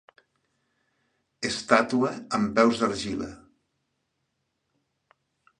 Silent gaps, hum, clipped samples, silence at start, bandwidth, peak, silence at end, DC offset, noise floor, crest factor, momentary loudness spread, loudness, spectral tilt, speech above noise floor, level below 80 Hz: none; none; under 0.1%; 1.4 s; 10.5 kHz; -2 dBFS; 2.25 s; under 0.1%; -78 dBFS; 26 dB; 12 LU; -25 LUFS; -4.5 dB/octave; 53 dB; -60 dBFS